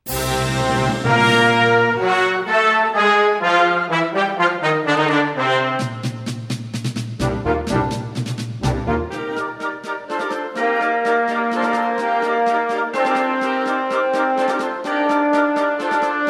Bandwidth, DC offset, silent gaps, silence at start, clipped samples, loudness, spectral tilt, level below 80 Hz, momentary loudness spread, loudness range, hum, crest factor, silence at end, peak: 18 kHz; under 0.1%; none; 0.05 s; under 0.1%; -18 LUFS; -5 dB/octave; -40 dBFS; 11 LU; 7 LU; none; 18 dB; 0 s; -2 dBFS